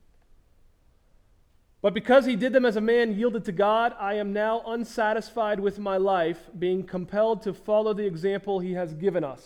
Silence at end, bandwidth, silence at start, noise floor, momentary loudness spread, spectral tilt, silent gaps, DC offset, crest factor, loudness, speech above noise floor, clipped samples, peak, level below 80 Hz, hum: 0.1 s; 13.5 kHz; 1.85 s; -60 dBFS; 7 LU; -6.5 dB/octave; none; under 0.1%; 20 dB; -25 LUFS; 36 dB; under 0.1%; -6 dBFS; -58 dBFS; none